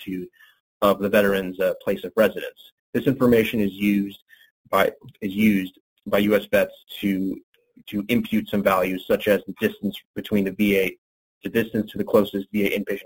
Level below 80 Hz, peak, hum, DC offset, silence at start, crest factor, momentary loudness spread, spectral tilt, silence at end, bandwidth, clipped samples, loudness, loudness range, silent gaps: -54 dBFS; -4 dBFS; none; under 0.1%; 0 s; 20 dB; 12 LU; -6 dB/octave; 0.05 s; 17 kHz; under 0.1%; -23 LUFS; 2 LU; 0.60-0.80 s, 2.72-2.93 s, 4.22-4.26 s, 4.51-4.64 s, 5.80-5.96 s, 7.43-7.52 s, 10.05-10.14 s, 10.98-11.41 s